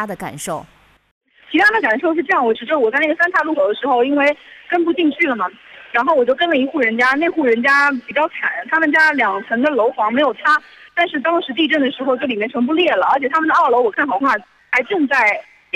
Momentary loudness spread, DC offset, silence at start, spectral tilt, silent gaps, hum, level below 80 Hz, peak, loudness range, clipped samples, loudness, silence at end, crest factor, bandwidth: 8 LU; under 0.1%; 0 s; -4 dB/octave; 1.11-1.21 s; none; -62 dBFS; -2 dBFS; 2 LU; under 0.1%; -16 LUFS; 0.35 s; 14 dB; 14 kHz